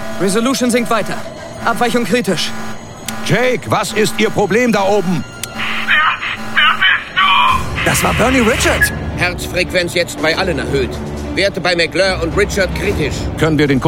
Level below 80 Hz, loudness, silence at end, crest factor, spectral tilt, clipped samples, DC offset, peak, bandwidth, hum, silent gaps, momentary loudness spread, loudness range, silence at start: -30 dBFS; -14 LUFS; 0 s; 14 dB; -4 dB/octave; under 0.1%; under 0.1%; 0 dBFS; 16.5 kHz; none; none; 9 LU; 4 LU; 0 s